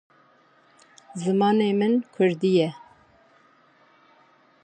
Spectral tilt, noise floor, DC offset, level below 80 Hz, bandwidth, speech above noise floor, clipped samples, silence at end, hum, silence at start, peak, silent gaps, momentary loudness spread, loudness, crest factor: -7 dB/octave; -59 dBFS; under 0.1%; -74 dBFS; 9.4 kHz; 37 dB; under 0.1%; 1.85 s; none; 1.15 s; -10 dBFS; none; 9 LU; -23 LUFS; 16 dB